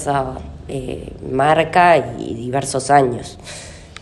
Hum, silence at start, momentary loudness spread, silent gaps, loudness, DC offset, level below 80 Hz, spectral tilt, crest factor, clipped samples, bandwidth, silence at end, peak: none; 0 s; 20 LU; none; -17 LUFS; under 0.1%; -40 dBFS; -5 dB/octave; 18 dB; under 0.1%; 12 kHz; 0 s; 0 dBFS